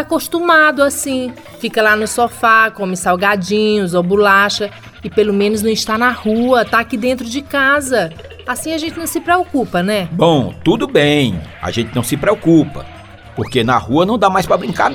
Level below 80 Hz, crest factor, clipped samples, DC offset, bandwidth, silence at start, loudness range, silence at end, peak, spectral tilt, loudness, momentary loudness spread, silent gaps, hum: -42 dBFS; 14 dB; under 0.1%; under 0.1%; 19.5 kHz; 0 s; 3 LU; 0 s; 0 dBFS; -4.5 dB/octave; -14 LUFS; 11 LU; none; none